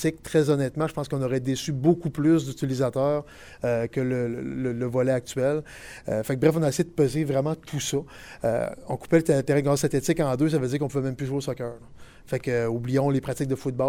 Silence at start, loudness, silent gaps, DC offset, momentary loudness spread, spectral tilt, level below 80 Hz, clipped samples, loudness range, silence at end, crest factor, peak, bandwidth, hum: 0 s; -25 LUFS; none; under 0.1%; 9 LU; -6.5 dB/octave; -52 dBFS; under 0.1%; 2 LU; 0 s; 18 dB; -6 dBFS; 16.5 kHz; none